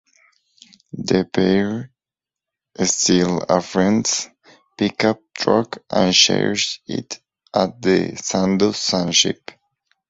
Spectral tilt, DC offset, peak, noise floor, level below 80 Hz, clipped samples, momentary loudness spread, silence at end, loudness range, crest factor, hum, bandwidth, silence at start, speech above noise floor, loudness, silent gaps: -3.5 dB/octave; under 0.1%; 0 dBFS; -89 dBFS; -54 dBFS; under 0.1%; 13 LU; 0.75 s; 2 LU; 20 dB; none; 8 kHz; 0.95 s; 71 dB; -18 LUFS; none